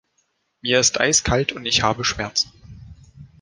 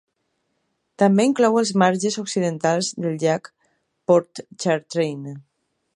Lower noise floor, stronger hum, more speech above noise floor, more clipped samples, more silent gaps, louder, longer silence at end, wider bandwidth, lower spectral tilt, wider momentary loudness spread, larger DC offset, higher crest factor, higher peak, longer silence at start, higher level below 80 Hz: second, -69 dBFS vs -73 dBFS; neither; second, 48 dB vs 53 dB; neither; neither; about the same, -19 LUFS vs -20 LUFS; second, 0.15 s vs 0.55 s; about the same, 11 kHz vs 11.5 kHz; second, -2 dB/octave vs -5 dB/octave; second, 7 LU vs 14 LU; neither; about the same, 20 dB vs 20 dB; about the same, -2 dBFS vs -2 dBFS; second, 0.65 s vs 1 s; first, -42 dBFS vs -72 dBFS